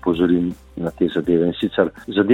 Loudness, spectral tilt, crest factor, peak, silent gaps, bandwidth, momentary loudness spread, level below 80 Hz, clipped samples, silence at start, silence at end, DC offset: -20 LUFS; -8 dB/octave; 16 dB; -2 dBFS; none; 8.4 kHz; 9 LU; -46 dBFS; under 0.1%; 0.05 s; 0 s; under 0.1%